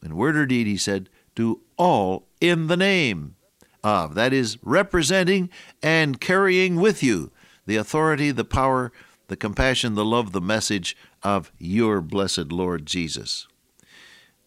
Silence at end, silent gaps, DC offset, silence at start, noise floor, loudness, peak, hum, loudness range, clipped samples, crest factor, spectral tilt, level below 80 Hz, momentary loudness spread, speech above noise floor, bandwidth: 1.05 s; none; under 0.1%; 0 s; -55 dBFS; -22 LUFS; -6 dBFS; none; 4 LU; under 0.1%; 18 dB; -4.5 dB/octave; -44 dBFS; 10 LU; 33 dB; 15.5 kHz